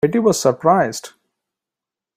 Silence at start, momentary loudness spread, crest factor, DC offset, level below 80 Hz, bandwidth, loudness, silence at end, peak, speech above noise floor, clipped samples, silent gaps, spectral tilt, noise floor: 0.05 s; 8 LU; 18 dB; under 0.1%; -60 dBFS; 16 kHz; -16 LUFS; 1.1 s; -2 dBFS; 71 dB; under 0.1%; none; -5 dB/octave; -87 dBFS